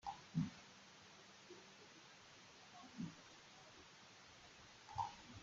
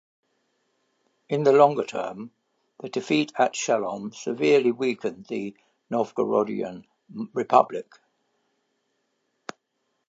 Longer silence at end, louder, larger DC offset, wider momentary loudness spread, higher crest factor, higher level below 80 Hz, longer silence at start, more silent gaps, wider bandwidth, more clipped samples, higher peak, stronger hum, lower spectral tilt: second, 0 s vs 2.3 s; second, -54 LUFS vs -24 LUFS; neither; second, 15 LU vs 21 LU; about the same, 24 dB vs 24 dB; about the same, -78 dBFS vs -76 dBFS; second, 0 s vs 1.3 s; neither; about the same, 7.8 kHz vs 7.8 kHz; neither; second, -30 dBFS vs -2 dBFS; neither; about the same, -5 dB/octave vs -5 dB/octave